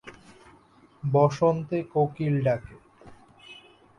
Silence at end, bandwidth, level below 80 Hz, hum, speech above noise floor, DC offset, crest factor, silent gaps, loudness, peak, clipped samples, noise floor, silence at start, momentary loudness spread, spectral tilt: 0.45 s; 10 kHz; -60 dBFS; none; 33 dB; under 0.1%; 20 dB; none; -25 LUFS; -8 dBFS; under 0.1%; -57 dBFS; 0.05 s; 25 LU; -8.5 dB/octave